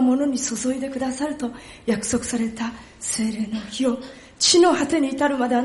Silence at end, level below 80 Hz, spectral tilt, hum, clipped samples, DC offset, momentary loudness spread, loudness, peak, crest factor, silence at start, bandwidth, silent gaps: 0 s; -52 dBFS; -3 dB/octave; none; under 0.1%; under 0.1%; 14 LU; -22 LUFS; -6 dBFS; 16 dB; 0 s; 11.5 kHz; none